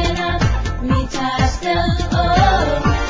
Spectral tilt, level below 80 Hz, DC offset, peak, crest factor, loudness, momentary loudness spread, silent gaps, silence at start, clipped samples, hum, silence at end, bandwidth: -5.5 dB/octave; -22 dBFS; under 0.1%; -2 dBFS; 14 dB; -17 LUFS; 5 LU; none; 0 s; under 0.1%; none; 0 s; 7.8 kHz